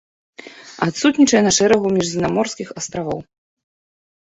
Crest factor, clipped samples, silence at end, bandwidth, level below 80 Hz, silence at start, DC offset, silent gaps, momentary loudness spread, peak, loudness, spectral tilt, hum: 18 dB; under 0.1%; 1.1 s; 8.4 kHz; -52 dBFS; 0.45 s; under 0.1%; none; 14 LU; -2 dBFS; -17 LUFS; -4 dB/octave; none